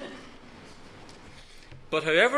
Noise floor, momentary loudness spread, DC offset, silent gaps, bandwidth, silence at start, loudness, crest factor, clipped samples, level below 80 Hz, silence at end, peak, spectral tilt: -48 dBFS; 25 LU; under 0.1%; none; 11 kHz; 0 s; -25 LUFS; 22 dB; under 0.1%; -54 dBFS; 0 s; -8 dBFS; -3.5 dB/octave